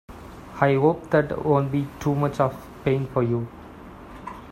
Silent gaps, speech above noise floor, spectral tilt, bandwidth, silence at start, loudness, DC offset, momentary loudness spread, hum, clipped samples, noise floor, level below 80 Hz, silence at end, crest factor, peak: none; 20 dB; -8 dB/octave; 13.5 kHz; 0.1 s; -23 LUFS; under 0.1%; 22 LU; none; under 0.1%; -42 dBFS; -50 dBFS; 0 s; 20 dB; -4 dBFS